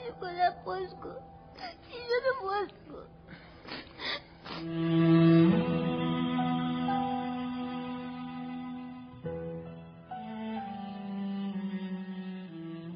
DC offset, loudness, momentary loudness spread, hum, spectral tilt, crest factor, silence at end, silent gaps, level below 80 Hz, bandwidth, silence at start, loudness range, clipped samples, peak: under 0.1%; -32 LUFS; 19 LU; none; -6 dB/octave; 18 dB; 0 s; none; -62 dBFS; 5.4 kHz; 0 s; 12 LU; under 0.1%; -14 dBFS